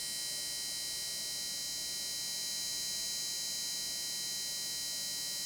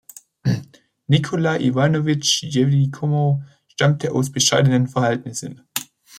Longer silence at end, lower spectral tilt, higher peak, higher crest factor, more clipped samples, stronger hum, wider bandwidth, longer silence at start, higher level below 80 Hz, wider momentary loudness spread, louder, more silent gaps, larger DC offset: about the same, 0 s vs 0 s; second, 1.5 dB/octave vs -5 dB/octave; second, -26 dBFS vs -2 dBFS; second, 12 dB vs 18 dB; neither; neither; first, over 20 kHz vs 16.5 kHz; second, 0 s vs 0.45 s; second, -70 dBFS vs -58 dBFS; second, 1 LU vs 12 LU; second, -35 LUFS vs -19 LUFS; neither; neither